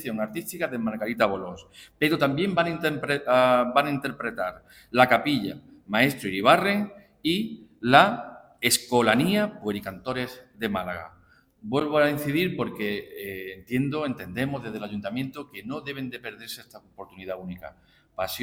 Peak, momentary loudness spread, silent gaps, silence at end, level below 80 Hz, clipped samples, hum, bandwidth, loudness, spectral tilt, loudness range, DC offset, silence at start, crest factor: -2 dBFS; 17 LU; none; 0 s; -60 dBFS; under 0.1%; none; 17.5 kHz; -25 LUFS; -4.5 dB/octave; 10 LU; under 0.1%; 0 s; 24 dB